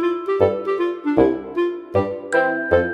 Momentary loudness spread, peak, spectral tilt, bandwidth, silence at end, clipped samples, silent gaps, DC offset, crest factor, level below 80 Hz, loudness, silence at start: 5 LU; -2 dBFS; -7 dB/octave; 10 kHz; 0 s; under 0.1%; none; under 0.1%; 18 dB; -48 dBFS; -20 LUFS; 0 s